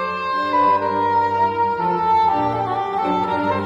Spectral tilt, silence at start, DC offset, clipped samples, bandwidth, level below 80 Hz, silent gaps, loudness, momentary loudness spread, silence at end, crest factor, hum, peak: -7 dB/octave; 0 s; under 0.1%; under 0.1%; 7.4 kHz; -54 dBFS; none; -19 LUFS; 5 LU; 0 s; 12 dB; none; -6 dBFS